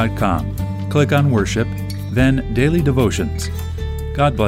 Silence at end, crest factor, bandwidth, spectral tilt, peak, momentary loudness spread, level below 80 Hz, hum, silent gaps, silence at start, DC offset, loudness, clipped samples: 0 s; 16 dB; 16 kHz; -6.5 dB/octave; -2 dBFS; 9 LU; -28 dBFS; none; none; 0 s; under 0.1%; -18 LUFS; under 0.1%